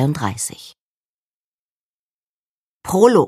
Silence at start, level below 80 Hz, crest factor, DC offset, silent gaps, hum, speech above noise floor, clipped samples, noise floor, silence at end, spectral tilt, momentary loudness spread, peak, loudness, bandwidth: 0 s; -56 dBFS; 20 dB; under 0.1%; 0.80-2.80 s; none; over 74 dB; under 0.1%; under -90 dBFS; 0 s; -5.5 dB/octave; 22 LU; 0 dBFS; -19 LUFS; 15.5 kHz